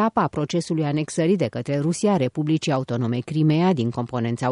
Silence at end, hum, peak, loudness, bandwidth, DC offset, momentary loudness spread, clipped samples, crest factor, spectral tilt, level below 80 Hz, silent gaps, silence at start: 0 s; none; -8 dBFS; -22 LUFS; 11 kHz; under 0.1%; 5 LU; under 0.1%; 14 dB; -6.5 dB/octave; -60 dBFS; none; 0 s